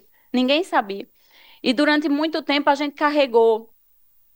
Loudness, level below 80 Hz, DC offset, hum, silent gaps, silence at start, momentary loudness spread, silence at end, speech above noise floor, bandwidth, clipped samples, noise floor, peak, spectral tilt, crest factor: -20 LUFS; -70 dBFS; under 0.1%; none; none; 0.35 s; 9 LU; 0.7 s; 39 dB; 16.5 kHz; under 0.1%; -58 dBFS; -4 dBFS; -4 dB/octave; 16 dB